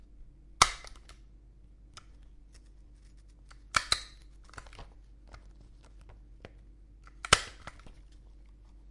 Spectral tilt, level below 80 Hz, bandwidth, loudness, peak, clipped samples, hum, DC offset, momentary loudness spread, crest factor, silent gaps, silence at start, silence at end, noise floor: -1 dB/octave; -50 dBFS; 11.5 kHz; -28 LUFS; 0 dBFS; under 0.1%; none; under 0.1%; 29 LU; 38 dB; none; 0.15 s; 0 s; -55 dBFS